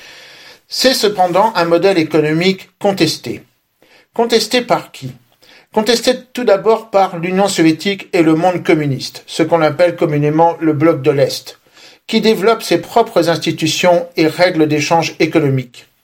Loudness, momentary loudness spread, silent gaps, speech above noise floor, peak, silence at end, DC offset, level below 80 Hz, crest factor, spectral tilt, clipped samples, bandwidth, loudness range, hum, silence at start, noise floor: -14 LUFS; 8 LU; none; 38 dB; 0 dBFS; 0.25 s; under 0.1%; -58 dBFS; 14 dB; -5 dB/octave; under 0.1%; 16.5 kHz; 3 LU; none; 0.05 s; -51 dBFS